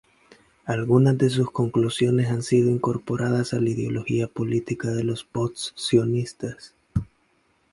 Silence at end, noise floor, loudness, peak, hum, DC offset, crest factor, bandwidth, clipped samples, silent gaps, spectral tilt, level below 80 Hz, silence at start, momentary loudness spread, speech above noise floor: 0.7 s; -65 dBFS; -24 LUFS; -6 dBFS; none; under 0.1%; 18 dB; 11.5 kHz; under 0.1%; none; -6.5 dB/octave; -50 dBFS; 0.65 s; 11 LU; 43 dB